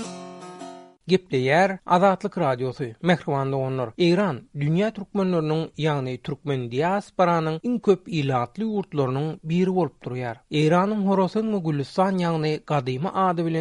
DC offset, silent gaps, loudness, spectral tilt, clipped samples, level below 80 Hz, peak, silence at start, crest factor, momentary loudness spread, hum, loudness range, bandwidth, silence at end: under 0.1%; none; -24 LUFS; -7 dB/octave; under 0.1%; -60 dBFS; -6 dBFS; 0 s; 18 dB; 9 LU; none; 2 LU; 10.5 kHz; 0 s